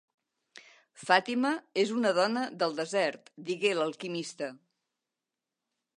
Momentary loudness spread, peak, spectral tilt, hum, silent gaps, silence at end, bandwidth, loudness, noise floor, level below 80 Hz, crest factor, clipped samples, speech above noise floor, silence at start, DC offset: 12 LU; -8 dBFS; -4 dB/octave; none; none; 1.4 s; 11 kHz; -30 LUFS; -89 dBFS; -86 dBFS; 24 dB; under 0.1%; 59 dB; 0.55 s; under 0.1%